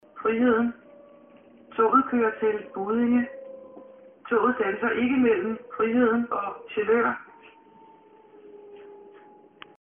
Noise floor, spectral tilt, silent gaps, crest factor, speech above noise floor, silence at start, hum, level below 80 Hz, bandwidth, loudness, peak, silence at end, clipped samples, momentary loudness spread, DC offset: -53 dBFS; -0.5 dB/octave; none; 18 dB; 30 dB; 0.15 s; none; -64 dBFS; 3.6 kHz; -24 LUFS; -8 dBFS; 0.75 s; under 0.1%; 22 LU; under 0.1%